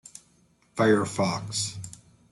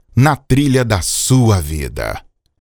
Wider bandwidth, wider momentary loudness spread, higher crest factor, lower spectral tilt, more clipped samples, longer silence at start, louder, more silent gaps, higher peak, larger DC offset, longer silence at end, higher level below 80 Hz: second, 12 kHz vs over 20 kHz; first, 20 LU vs 11 LU; about the same, 18 dB vs 14 dB; about the same, -4.5 dB/octave vs -5 dB/octave; neither; about the same, 0.15 s vs 0.15 s; second, -26 LUFS vs -15 LUFS; neither; second, -10 dBFS vs 0 dBFS; neither; about the same, 0.35 s vs 0.45 s; second, -64 dBFS vs -30 dBFS